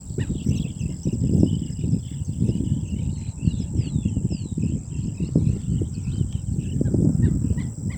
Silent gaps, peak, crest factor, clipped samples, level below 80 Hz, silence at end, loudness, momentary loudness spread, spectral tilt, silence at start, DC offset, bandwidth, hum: none; -2 dBFS; 20 dB; under 0.1%; -34 dBFS; 0 s; -25 LUFS; 7 LU; -8 dB/octave; 0 s; under 0.1%; 9.4 kHz; none